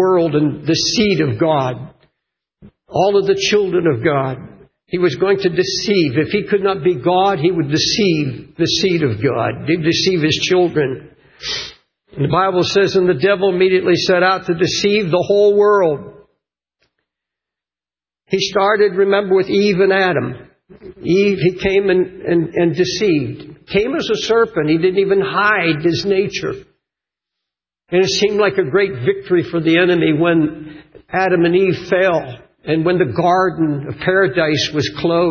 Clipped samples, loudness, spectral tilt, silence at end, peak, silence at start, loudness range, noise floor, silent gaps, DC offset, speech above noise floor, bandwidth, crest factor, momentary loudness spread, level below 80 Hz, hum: under 0.1%; -15 LUFS; -5 dB/octave; 0 s; -2 dBFS; 0 s; 3 LU; under -90 dBFS; none; under 0.1%; over 75 dB; 7.2 kHz; 14 dB; 9 LU; -48 dBFS; none